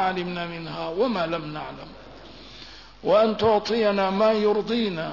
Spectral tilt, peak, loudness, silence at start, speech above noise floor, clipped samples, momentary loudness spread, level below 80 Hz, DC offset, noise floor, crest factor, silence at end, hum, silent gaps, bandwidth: -6 dB/octave; -10 dBFS; -23 LUFS; 0 s; 21 dB; under 0.1%; 22 LU; -54 dBFS; 0.2%; -45 dBFS; 16 dB; 0 s; none; none; 6 kHz